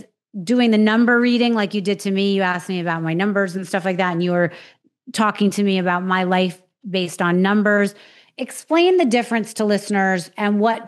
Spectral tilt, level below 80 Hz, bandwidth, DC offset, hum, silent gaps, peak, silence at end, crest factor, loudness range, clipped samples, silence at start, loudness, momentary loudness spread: -5.5 dB/octave; -84 dBFS; 12.5 kHz; under 0.1%; none; none; -4 dBFS; 0 s; 16 dB; 3 LU; under 0.1%; 0.35 s; -19 LUFS; 9 LU